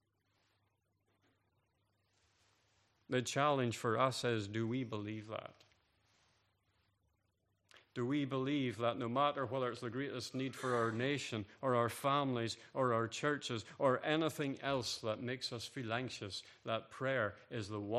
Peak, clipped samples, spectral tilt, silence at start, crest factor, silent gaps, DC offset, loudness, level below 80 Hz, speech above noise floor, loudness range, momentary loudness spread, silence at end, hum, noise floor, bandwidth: -18 dBFS; under 0.1%; -5 dB/octave; 3.1 s; 22 dB; none; under 0.1%; -38 LUFS; -80 dBFS; 43 dB; 8 LU; 9 LU; 0 s; none; -81 dBFS; 14 kHz